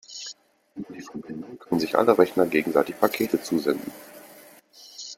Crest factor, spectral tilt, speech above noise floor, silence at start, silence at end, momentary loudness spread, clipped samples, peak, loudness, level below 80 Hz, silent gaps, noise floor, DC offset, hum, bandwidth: 24 dB; -5 dB/octave; 26 dB; 0.1 s; 0.05 s; 23 LU; under 0.1%; -2 dBFS; -23 LUFS; -68 dBFS; none; -50 dBFS; under 0.1%; none; 16.5 kHz